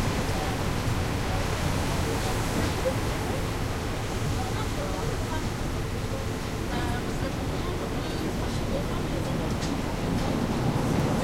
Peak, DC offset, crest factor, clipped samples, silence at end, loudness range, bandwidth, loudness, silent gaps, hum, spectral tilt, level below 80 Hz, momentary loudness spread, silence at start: -14 dBFS; under 0.1%; 14 dB; under 0.1%; 0 s; 2 LU; 16 kHz; -29 LUFS; none; none; -5.5 dB/octave; -34 dBFS; 4 LU; 0 s